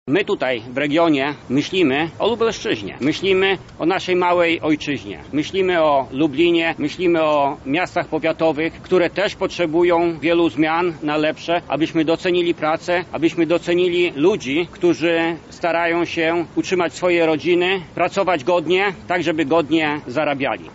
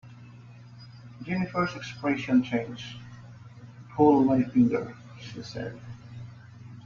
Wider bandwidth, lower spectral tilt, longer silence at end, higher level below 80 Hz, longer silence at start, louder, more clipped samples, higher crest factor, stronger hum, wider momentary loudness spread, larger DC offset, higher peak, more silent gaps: first, 8 kHz vs 7 kHz; second, -3.5 dB/octave vs -7.5 dB/octave; about the same, 0 s vs 0 s; first, -52 dBFS vs -60 dBFS; about the same, 0.05 s vs 0.05 s; first, -19 LUFS vs -26 LUFS; neither; second, 14 dB vs 20 dB; second, none vs 60 Hz at -45 dBFS; second, 5 LU vs 26 LU; neither; about the same, -6 dBFS vs -8 dBFS; neither